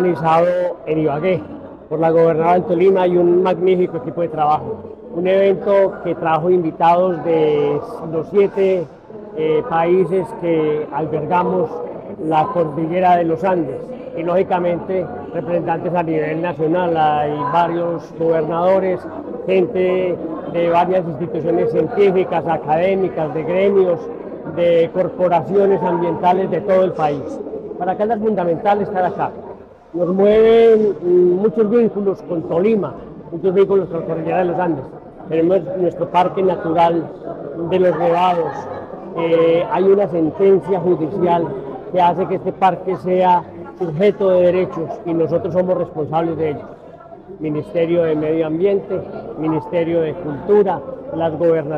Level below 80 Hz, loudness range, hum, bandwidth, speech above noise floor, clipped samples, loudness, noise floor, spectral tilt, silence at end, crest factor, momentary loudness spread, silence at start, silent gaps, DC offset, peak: -52 dBFS; 4 LU; none; 6.4 kHz; 22 dB; under 0.1%; -17 LUFS; -38 dBFS; -9 dB/octave; 0 s; 12 dB; 11 LU; 0 s; none; under 0.1%; -4 dBFS